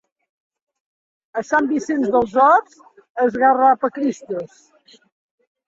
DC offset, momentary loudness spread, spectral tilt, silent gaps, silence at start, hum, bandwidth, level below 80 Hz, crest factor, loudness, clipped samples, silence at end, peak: under 0.1%; 15 LU; -5.5 dB/octave; 3.10-3.15 s; 1.35 s; none; 7.8 kHz; -62 dBFS; 18 dB; -17 LUFS; under 0.1%; 1.2 s; -2 dBFS